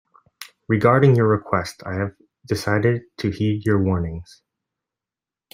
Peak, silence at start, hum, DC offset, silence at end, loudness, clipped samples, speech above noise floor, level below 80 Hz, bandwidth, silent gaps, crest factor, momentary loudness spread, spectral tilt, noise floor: -2 dBFS; 0.4 s; none; under 0.1%; 1.3 s; -21 LUFS; under 0.1%; 70 dB; -52 dBFS; 16 kHz; none; 20 dB; 16 LU; -7.5 dB/octave; -89 dBFS